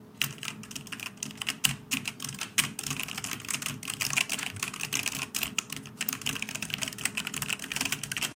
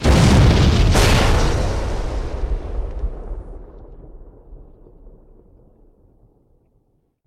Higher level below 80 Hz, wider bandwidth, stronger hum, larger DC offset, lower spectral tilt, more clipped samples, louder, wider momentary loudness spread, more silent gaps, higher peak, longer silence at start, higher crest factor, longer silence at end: second, -64 dBFS vs -22 dBFS; first, 17 kHz vs 15 kHz; neither; neither; second, -1 dB/octave vs -5.5 dB/octave; neither; second, -31 LUFS vs -18 LUFS; second, 9 LU vs 22 LU; neither; about the same, -4 dBFS vs -6 dBFS; about the same, 0 s vs 0 s; first, 30 dB vs 14 dB; second, 0 s vs 2.2 s